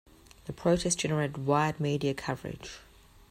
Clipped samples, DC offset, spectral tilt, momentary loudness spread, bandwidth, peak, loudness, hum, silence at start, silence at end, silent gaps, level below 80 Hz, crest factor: under 0.1%; under 0.1%; -5 dB/octave; 17 LU; 15 kHz; -12 dBFS; -30 LUFS; none; 0.45 s; 0.5 s; none; -54 dBFS; 20 dB